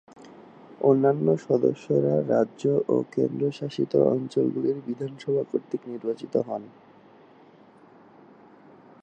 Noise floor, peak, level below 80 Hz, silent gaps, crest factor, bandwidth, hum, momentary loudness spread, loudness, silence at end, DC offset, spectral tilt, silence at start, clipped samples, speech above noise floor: -53 dBFS; -8 dBFS; -74 dBFS; none; 20 dB; 8.6 kHz; none; 10 LU; -25 LUFS; 2.35 s; under 0.1%; -8.5 dB/octave; 0.2 s; under 0.1%; 29 dB